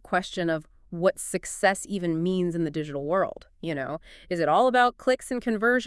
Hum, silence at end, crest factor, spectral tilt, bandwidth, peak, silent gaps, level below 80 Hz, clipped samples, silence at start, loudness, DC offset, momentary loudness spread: none; 0 s; 18 dB; -5 dB/octave; 12 kHz; -8 dBFS; none; -56 dBFS; under 0.1%; 0.1 s; -26 LUFS; under 0.1%; 11 LU